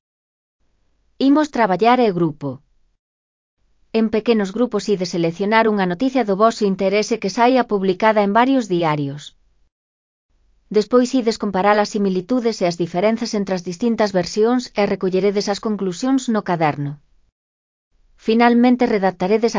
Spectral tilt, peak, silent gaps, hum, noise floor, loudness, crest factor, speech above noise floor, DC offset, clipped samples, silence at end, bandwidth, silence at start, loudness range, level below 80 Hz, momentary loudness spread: -6 dB/octave; 0 dBFS; 2.99-3.57 s, 9.72-10.29 s, 17.32-17.91 s; none; -62 dBFS; -18 LUFS; 18 dB; 44 dB; under 0.1%; under 0.1%; 0 s; 7.6 kHz; 1.2 s; 4 LU; -56 dBFS; 7 LU